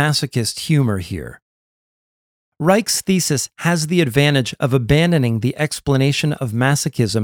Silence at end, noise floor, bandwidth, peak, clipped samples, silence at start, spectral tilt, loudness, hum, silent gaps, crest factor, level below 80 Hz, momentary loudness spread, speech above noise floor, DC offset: 0 s; under -90 dBFS; 17.5 kHz; 0 dBFS; under 0.1%; 0 s; -5 dB/octave; -17 LUFS; none; 1.42-2.52 s; 16 dB; -44 dBFS; 6 LU; over 73 dB; under 0.1%